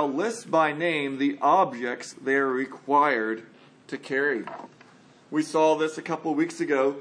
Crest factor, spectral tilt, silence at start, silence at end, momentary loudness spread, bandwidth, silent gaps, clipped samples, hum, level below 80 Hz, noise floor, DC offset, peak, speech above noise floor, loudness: 18 dB; -4.5 dB/octave; 0 s; 0 s; 11 LU; 10.5 kHz; none; under 0.1%; none; -84 dBFS; -54 dBFS; under 0.1%; -8 dBFS; 29 dB; -25 LUFS